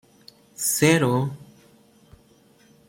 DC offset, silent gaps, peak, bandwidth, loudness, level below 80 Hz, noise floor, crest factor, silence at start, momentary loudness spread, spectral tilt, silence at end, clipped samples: under 0.1%; none; -4 dBFS; 16.5 kHz; -21 LUFS; -62 dBFS; -56 dBFS; 22 dB; 0.6 s; 24 LU; -4.5 dB/octave; 1.45 s; under 0.1%